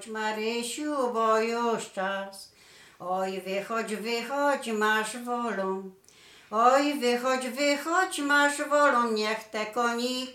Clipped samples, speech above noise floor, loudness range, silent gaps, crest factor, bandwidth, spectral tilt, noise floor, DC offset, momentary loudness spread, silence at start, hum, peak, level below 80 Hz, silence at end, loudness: under 0.1%; 26 dB; 5 LU; none; 20 dB; 16.5 kHz; -3 dB/octave; -54 dBFS; under 0.1%; 10 LU; 0 s; none; -8 dBFS; -76 dBFS; 0 s; -27 LUFS